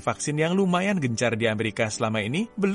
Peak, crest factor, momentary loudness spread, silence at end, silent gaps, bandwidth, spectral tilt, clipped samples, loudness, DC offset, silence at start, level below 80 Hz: -8 dBFS; 16 dB; 4 LU; 0 s; none; 11.5 kHz; -5 dB/octave; under 0.1%; -25 LUFS; under 0.1%; 0 s; -60 dBFS